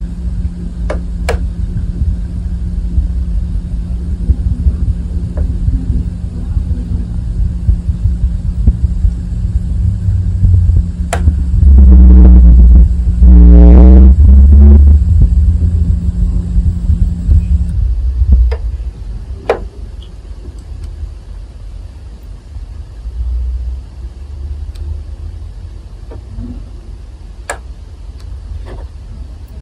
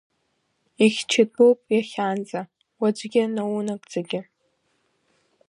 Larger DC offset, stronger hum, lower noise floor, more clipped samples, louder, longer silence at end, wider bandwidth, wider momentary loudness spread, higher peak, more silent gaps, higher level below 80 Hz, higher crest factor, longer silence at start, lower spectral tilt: neither; neither; second, -29 dBFS vs -72 dBFS; first, 3% vs under 0.1%; first, -11 LUFS vs -23 LUFS; second, 0 s vs 1.3 s; second, 7.8 kHz vs 11 kHz; first, 25 LU vs 14 LU; first, 0 dBFS vs -4 dBFS; neither; first, -10 dBFS vs -76 dBFS; second, 10 dB vs 20 dB; second, 0 s vs 0.8 s; first, -9 dB/octave vs -4.5 dB/octave